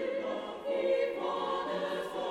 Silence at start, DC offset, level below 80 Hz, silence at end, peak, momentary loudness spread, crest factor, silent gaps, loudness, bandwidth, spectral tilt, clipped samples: 0 s; under 0.1%; -70 dBFS; 0 s; -20 dBFS; 5 LU; 14 dB; none; -34 LUFS; 13 kHz; -5 dB/octave; under 0.1%